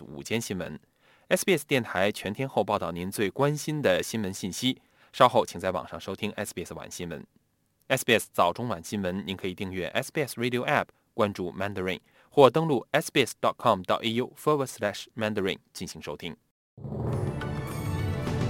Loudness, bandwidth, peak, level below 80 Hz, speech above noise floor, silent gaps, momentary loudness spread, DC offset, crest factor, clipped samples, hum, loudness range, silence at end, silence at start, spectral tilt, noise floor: -28 LUFS; 17 kHz; -2 dBFS; -54 dBFS; 43 dB; 16.51-16.77 s; 14 LU; under 0.1%; 26 dB; under 0.1%; none; 5 LU; 0 s; 0 s; -5 dB/octave; -71 dBFS